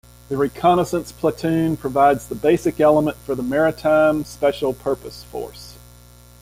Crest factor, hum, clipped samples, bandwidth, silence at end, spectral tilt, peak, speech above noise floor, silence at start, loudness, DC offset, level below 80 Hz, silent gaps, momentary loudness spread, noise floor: 16 dB; 60 Hz at -40 dBFS; under 0.1%; 16 kHz; 0.65 s; -6.5 dB/octave; -2 dBFS; 27 dB; 0.3 s; -19 LUFS; under 0.1%; -46 dBFS; none; 14 LU; -46 dBFS